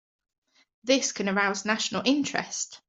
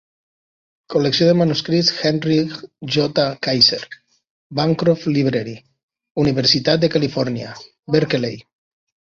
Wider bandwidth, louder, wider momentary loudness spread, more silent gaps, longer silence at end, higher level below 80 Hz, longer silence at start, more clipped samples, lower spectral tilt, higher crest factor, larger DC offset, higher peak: first, 8.2 kHz vs 7.4 kHz; second, -26 LUFS vs -18 LUFS; second, 6 LU vs 15 LU; second, none vs 4.30-4.50 s, 5.83-5.88 s, 6.11-6.15 s; second, 0.1 s vs 0.8 s; second, -72 dBFS vs -54 dBFS; about the same, 0.85 s vs 0.9 s; neither; second, -2.5 dB/octave vs -5.5 dB/octave; about the same, 20 dB vs 18 dB; neither; second, -10 dBFS vs -2 dBFS